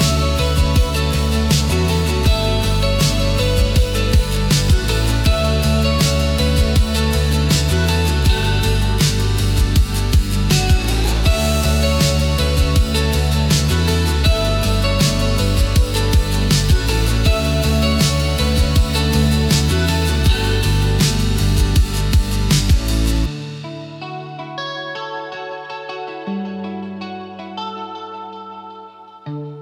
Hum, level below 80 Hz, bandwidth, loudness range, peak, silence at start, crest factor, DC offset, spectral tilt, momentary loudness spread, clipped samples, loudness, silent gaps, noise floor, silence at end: none; -20 dBFS; 17.5 kHz; 11 LU; -4 dBFS; 0 s; 12 dB; under 0.1%; -5 dB/octave; 13 LU; under 0.1%; -17 LUFS; none; -38 dBFS; 0 s